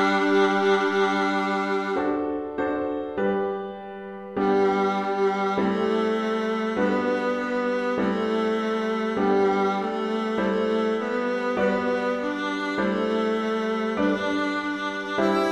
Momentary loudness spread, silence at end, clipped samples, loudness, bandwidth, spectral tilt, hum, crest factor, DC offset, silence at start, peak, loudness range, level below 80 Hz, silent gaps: 6 LU; 0 s; under 0.1%; -24 LUFS; 9.8 kHz; -6 dB/octave; none; 16 dB; under 0.1%; 0 s; -8 dBFS; 2 LU; -58 dBFS; none